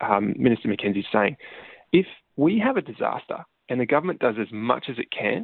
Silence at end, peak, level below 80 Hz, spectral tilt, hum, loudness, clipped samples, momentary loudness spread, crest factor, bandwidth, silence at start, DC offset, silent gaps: 0 s; -4 dBFS; -62 dBFS; -10 dB/octave; none; -24 LUFS; under 0.1%; 12 LU; 20 dB; 4.4 kHz; 0 s; under 0.1%; none